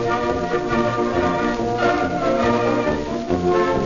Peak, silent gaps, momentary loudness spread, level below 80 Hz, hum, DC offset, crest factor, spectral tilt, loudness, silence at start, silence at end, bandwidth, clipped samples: -6 dBFS; none; 3 LU; -40 dBFS; none; under 0.1%; 14 dB; -6.5 dB/octave; -20 LUFS; 0 s; 0 s; 7.4 kHz; under 0.1%